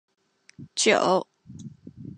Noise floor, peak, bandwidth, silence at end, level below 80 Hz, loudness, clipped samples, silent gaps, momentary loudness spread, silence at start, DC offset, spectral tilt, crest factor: -44 dBFS; -4 dBFS; 11 kHz; 0.05 s; -66 dBFS; -23 LUFS; under 0.1%; none; 24 LU; 0.6 s; under 0.1%; -2.5 dB/octave; 22 dB